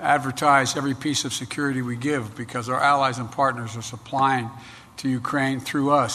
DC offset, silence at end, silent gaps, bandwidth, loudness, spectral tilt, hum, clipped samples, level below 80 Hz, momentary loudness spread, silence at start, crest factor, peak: under 0.1%; 0 s; none; 13.5 kHz; -23 LUFS; -4.5 dB/octave; none; under 0.1%; -60 dBFS; 12 LU; 0 s; 18 dB; -4 dBFS